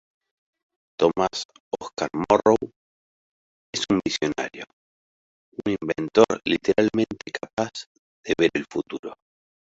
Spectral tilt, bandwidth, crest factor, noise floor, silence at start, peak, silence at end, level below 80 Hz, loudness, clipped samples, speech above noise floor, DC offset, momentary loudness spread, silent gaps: -4.5 dB/octave; 8 kHz; 24 dB; under -90 dBFS; 1 s; -2 dBFS; 0.5 s; -56 dBFS; -24 LUFS; under 0.1%; over 67 dB; under 0.1%; 19 LU; 1.45-1.49 s, 1.60-1.71 s, 2.76-3.73 s, 4.73-5.52 s, 7.53-7.57 s, 7.86-8.24 s, 8.99-9.03 s